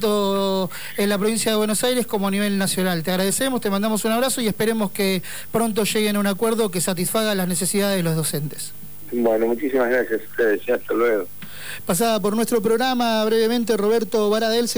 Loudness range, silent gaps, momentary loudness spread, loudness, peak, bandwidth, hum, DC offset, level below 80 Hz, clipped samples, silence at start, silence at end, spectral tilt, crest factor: 1 LU; none; 5 LU; -21 LUFS; -8 dBFS; over 20 kHz; none; 2%; -58 dBFS; under 0.1%; 0 s; 0 s; -4 dB/octave; 12 dB